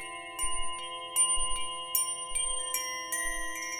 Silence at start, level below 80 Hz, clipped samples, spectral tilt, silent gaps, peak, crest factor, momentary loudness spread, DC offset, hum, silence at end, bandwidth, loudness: 0 s; -46 dBFS; under 0.1%; 1 dB/octave; none; -10 dBFS; 22 dB; 9 LU; under 0.1%; none; 0 s; over 20 kHz; -30 LUFS